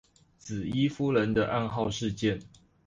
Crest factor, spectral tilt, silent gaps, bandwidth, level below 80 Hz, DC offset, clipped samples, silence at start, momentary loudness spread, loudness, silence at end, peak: 16 dB; -6 dB/octave; none; 9.8 kHz; -54 dBFS; under 0.1%; under 0.1%; 0.45 s; 12 LU; -29 LUFS; 0.4 s; -14 dBFS